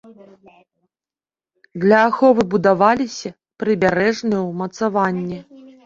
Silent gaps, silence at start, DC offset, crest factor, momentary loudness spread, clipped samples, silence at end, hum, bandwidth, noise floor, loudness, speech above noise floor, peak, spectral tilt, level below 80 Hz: none; 0.05 s; under 0.1%; 18 dB; 15 LU; under 0.1%; 0.45 s; none; 7.8 kHz; under -90 dBFS; -17 LUFS; over 73 dB; -2 dBFS; -6 dB/octave; -56 dBFS